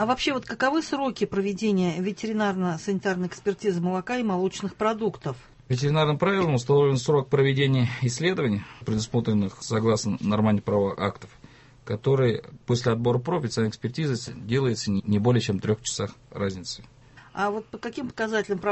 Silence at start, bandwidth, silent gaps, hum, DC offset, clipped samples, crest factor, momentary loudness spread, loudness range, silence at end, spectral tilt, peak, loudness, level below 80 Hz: 0 s; 8.4 kHz; none; none; under 0.1%; under 0.1%; 16 dB; 9 LU; 4 LU; 0 s; -6 dB/octave; -8 dBFS; -26 LUFS; -54 dBFS